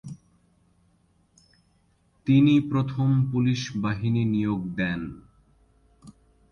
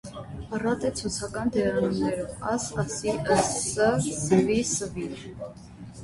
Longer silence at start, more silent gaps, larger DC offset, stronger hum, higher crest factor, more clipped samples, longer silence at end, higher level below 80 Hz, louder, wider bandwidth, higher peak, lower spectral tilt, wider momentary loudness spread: about the same, 0.05 s vs 0.05 s; neither; neither; neither; about the same, 16 dB vs 20 dB; neither; first, 0.4 s vs 0 s; second, -54 dBFS vs -48 dBFS; about the same, -24 LUFS vs -26 LUFS; second, 7 kHz vs 11.5 kHz; about the same, -10 dBFS vs -8 dBFS; first, -7.5 dB/octave vs -4.5 dB/octave; about the same, 15 LU vs 16 LU